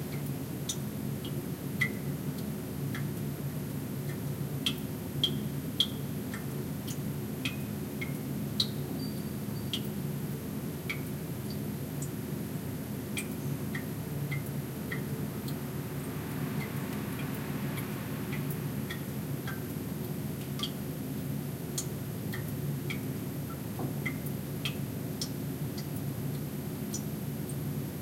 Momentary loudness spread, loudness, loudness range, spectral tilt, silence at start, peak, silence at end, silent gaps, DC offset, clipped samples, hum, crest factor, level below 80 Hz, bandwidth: 5 LU; -36 LUFS; 3 LU; -5 dB/octave; 0 s; -12 dBFS; 0 s; none; under 0.1%; under 0.1%; none; 24 dB; -56 dBFS; 16 kHz